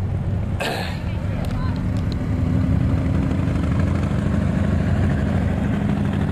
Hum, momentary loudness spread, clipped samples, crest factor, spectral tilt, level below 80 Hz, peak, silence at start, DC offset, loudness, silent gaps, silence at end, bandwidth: none; 4 LU; under 0.1%; 12 dB; -8 dB/octave; -30 dBFS; -8 dBFS; 0 s; under 0.1%; -22 LUFS; none; 0 s; 13 kHz